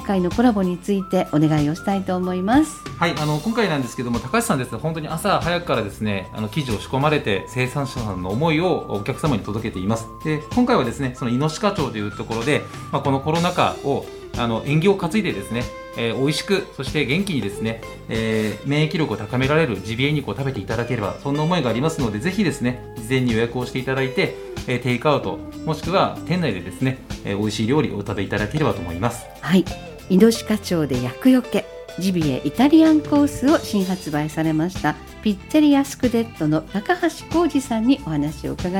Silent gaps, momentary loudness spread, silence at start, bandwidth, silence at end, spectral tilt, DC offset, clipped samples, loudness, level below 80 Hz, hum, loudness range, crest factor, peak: none; 8 LU; 0 s; 17 kHz; 0 s; -6 dB/octave; under 0.1%; under 0.1%; -21 LUFS; -42 dBFS; none; 4 LU; 18 dB; -2 dBFS